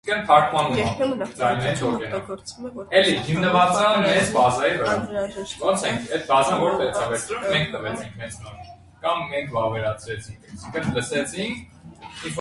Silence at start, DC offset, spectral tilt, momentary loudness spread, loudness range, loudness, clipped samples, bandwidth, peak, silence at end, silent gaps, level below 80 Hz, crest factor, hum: 0.05 s; under 0.1%; -4.5 dB/octave; 17 LU; 7 LU; -22 LUFS; under 0.1%; 11.5 kHz; -2 dBFS; 0 s; none; -50 dBFS; 20 dB; none